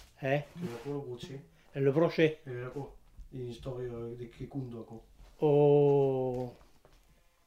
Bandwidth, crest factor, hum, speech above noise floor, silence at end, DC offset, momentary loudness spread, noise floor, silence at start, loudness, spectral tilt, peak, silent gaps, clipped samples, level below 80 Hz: 9 kHz; 20 dB; none; 33 dB; 0.95 s; under 0.1%; 21 LU; -64 dBFS; 0 s; -31 LUFS; -8 dB/octave; -12 dBFS; none; under 0.1%; -60 dBFS